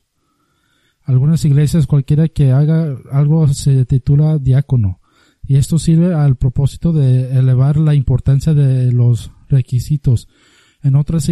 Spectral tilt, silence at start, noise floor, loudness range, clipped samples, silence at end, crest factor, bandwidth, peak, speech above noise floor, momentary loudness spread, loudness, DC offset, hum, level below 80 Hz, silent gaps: -8 dB/octave; 1.1 s; -63 dBFS; 2 LU; under 0.1%; 0 s; 10 dB; 12 kHz; -2 dBFS; 51 dB; 5 LU; -14 LUFS; under 0.1%; none; -32 dBFS; none